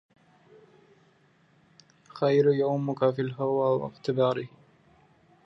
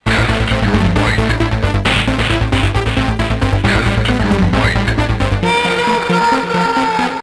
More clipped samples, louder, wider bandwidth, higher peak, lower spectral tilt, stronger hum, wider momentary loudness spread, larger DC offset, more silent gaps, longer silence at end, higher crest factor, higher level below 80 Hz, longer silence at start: neither; second, -26 LUFS vs -14 LUFS; second, 7.4 kHz vs 11 kHz; second, -10 dBFS vs 0 dBFS; first, -8.5 dB/octave vs -5.5 dB/octave; neither; first, 10 LU vs 2 LU; neither; neither; first, 1 s vs 0 s; first, 20 dB vs 14 dB; second, -72 dBFS vs -22 dBFS; first, 2.15 s vs 0.05 s